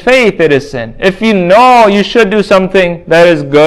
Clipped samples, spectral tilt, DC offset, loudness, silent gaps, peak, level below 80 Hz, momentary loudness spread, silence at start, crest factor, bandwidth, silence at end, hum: 4%; -5.5 dB/octave; under 0.1%; -7 LUFS; none; 0 dBFS; -38 dBFS; 8 LU; 0 s; 6 dB; 13 kHz; 0 s; none